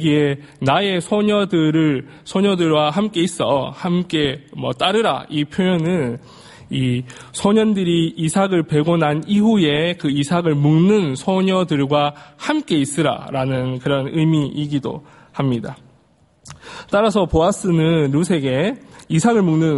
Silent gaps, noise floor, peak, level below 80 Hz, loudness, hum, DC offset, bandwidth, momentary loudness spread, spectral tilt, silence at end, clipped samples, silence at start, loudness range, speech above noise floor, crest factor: none; -55 dBFS; -2 dBFS; -46 dBFS; -18 LUFS; none; under 0.1%; 11.5 kHz; 8 LU; -6 dB/octave; 0 s; under 0.1%; 0 s; 4 LU; 38 dB; 16 dB